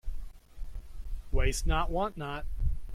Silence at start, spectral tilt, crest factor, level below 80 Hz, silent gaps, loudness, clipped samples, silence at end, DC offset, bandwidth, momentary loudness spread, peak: 0.05 s; -5 dB/octave; 16 dB; -34 dBFS; none; -33 LUFS; under 0.1%; 0 s; under 0.1%; 14.5 kHz; 18 LU; -14 dBFS